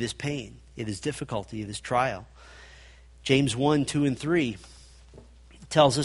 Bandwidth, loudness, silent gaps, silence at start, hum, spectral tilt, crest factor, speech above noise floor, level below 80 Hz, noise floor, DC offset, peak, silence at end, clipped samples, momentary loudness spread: 11.5 kHz; -27 LUFS; none; 0 s; none; -5 dB/octave; 22 dB; 25 dB; -52 dBFS; -51 dBFS; under 0.1%; -4 dBFS; 0 s; under 0.1%; 17 LU